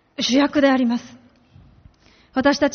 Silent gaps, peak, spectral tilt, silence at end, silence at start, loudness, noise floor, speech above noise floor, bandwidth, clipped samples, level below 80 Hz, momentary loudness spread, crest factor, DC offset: none; -2 dBFS; -2 dB/octave; 0 s; 0.2 s; -19 LUFS; -52 dBFS; 34 dB; 6.6 kHz; under 0.1%; -54 dBFS; 10 LU; 18 dB; under 0.1%